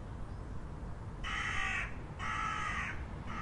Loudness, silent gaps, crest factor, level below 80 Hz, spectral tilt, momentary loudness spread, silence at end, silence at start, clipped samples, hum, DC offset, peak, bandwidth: -39 LUFS; none; 16 dB; -46 dBFS; -4 dB/octave; 11 LU; 0 s; 0 s; under 0.1%; none; under 0.1%; -24 dBFS; 11 kHz